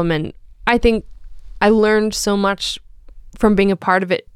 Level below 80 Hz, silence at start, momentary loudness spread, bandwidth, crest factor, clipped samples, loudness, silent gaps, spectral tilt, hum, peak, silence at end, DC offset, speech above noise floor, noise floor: -34 dBFS; 0 s; 10 LU; 14.5 kHz; 16 dB; under 0.1%; -17 LUFS; none; -5 dB/octave; none; -2 dBFS; 0.15 s; under 0.1%; 22 dB; -38 dBFS